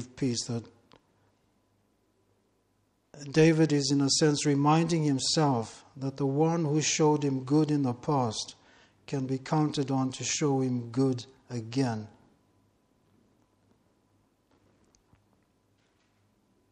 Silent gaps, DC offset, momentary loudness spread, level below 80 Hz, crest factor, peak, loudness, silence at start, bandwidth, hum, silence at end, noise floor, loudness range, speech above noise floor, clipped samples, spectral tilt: none; under 0.1%; 14 LU; -66 dBFS; 20 dB; -10 dBFS; -28 LUFS; 0 s; 10 kHz; none; 4.65 s; -72 dBFS; 13 LU; 45 dB; under 0.1%; -5 dB/octave